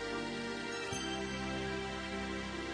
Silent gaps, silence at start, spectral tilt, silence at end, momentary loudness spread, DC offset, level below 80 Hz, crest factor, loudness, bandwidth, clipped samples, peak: none; 0 s; -4 dB/octave; 0 s; 2 LU; under 0.1%; -54 dBFS; 14 dB; -39 LUFS; 10 kHz; under 0.1%; -24 dBFS